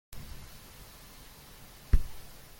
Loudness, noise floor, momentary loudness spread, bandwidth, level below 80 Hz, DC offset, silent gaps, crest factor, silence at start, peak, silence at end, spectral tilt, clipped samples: -39 LUFS; -51 dBFS; 17 LU; 17 kHz; -36 dBFS; under 0.1%; none; 24 dB; 0.1 s; -10 dBFS; 0.25 s; -5 dB/octave; under 0.1%